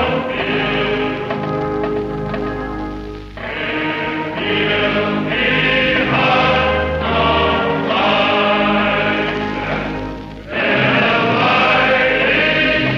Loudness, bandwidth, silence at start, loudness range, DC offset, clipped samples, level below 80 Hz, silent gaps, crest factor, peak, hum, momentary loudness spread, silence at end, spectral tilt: -16 LUFS; 7.6 kHz; 0 s; 7 LU; under 0.1%; under 0.1%; -36 dBFS; none; 14 dB; -2 dBFS; none; 11 LU; 0 s; -6.5 dB/octave